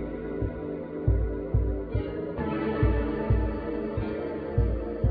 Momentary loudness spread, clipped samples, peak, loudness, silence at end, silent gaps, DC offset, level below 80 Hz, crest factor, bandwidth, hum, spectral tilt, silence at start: 6 LU; under 0.1%; -12 dBFS; -30 LUFS; 0 s; none; under 0.1%; -32 dBFS; 16 dB; 4.9 kHz; none; -12 dB/octave; 0 s